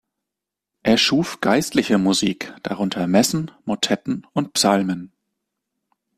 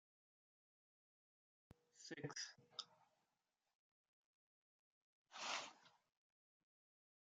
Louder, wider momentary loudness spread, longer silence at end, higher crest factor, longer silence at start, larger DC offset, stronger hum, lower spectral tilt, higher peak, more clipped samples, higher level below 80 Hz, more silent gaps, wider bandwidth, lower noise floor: first, -20 LUFS vs -51 LUFS; second, 9 LU vs 14 LU; second, 1.1 s vs 1.4 s; second, 18 dB vs 28 dB; second, 0.85 s vs 1.95 s; neither; neither; first, -4 dB/octave vs -2 dB/octave; first, -2 dBFS vs -30 dBFS; neither; first, -56 dBFS vs under -90 dBFS; second, none vs 3.75-5.25 s; first, 15.5 kHz vs 9 kHz; second, -85 dBFS vs under -90 dBFS